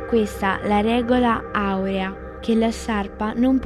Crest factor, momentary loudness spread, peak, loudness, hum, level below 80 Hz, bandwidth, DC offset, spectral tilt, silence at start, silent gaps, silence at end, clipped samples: 14 dB; 7 LU; -6 dBFS; -22 LUFS; none; -38 dBFS; 13.5 kHz; under 0.1%; -6 dB/octave; 0 s; none; 0 s; under 0.1%